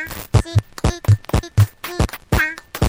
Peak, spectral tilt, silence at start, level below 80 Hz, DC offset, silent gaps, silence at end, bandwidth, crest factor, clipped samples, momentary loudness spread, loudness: -2 dBFS; -5.5 dB/octave; 0 s; -28 dBFS; under 0.1%; none; 0 s; 16.5 kHz; 18 dB; under 0.1%; 5 LU; -19 LUFS